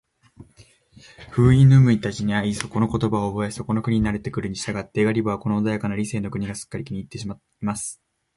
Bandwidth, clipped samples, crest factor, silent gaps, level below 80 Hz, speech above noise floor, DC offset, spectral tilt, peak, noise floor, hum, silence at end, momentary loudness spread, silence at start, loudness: 11.5 kHz; under 0.1%; 20 dB; none; -44 dBFS; 33 dB; under 0.1%; -7 dB/octave; -2 dBFS; -54 dBFS; none; 0.4 s; 16 LU; 0.4 s; -22 LUFS